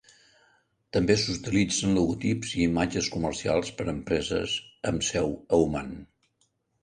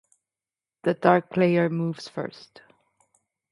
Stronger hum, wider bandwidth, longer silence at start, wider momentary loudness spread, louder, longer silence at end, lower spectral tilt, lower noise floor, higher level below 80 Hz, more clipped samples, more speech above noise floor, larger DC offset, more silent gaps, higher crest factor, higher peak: neither; about the same, 10.5 kHz vs 11 kHz; about the same, 0.95 s vs 0.85 s; second, 7 LU vs 13 LU; second, -27 LUFS vs -24 LUFS; second, 0.8 s vs 1.2 s; second, -4.5 dB/octave vs -7.5 dB/octave; second, -72 dBFS vs under -90 dBFS; first, -48 dBFS vs -72 dBFS; neither; second, 46 dB vs over 66 dB; neither; neither; about the same, 20 dB vs 24 dB; second, -8 dBFS vs -2 dBFS